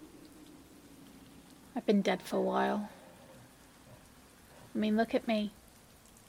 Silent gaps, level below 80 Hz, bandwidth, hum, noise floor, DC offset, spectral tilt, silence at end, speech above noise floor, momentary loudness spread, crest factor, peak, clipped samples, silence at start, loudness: none; -68 dBFS; 17 kHz; none; -59 dBFS; under 0.1%; -6 dB/octave; 0.8 s; 27 dB; 25 LU; 20 dB; -16 dBFS; under 0.1%; 0 s; -33 LUFS